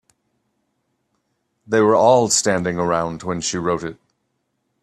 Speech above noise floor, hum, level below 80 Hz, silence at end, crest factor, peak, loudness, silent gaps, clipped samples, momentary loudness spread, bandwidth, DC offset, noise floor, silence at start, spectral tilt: 54 dB; none; -56 dBFS; 0.9 s; 20 dB; -2 dBFS; -18 LUFS; none; under 0.1%; 11 LU; 13 kHz; under 0.1%; -72 dBFS; 1.7 s; -4 dB/octave